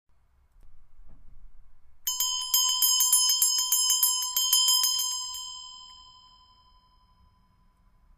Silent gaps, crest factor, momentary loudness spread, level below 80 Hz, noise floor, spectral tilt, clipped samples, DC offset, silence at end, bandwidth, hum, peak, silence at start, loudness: none; 22 dB; 17 LU; -58 dBFS; -63 dBFS; 5 dB/octave; under 0.1%; under 0.1%; 2.15 s; 16 kHz; none; -8 dBFS; 0.65 s; -22 LUFS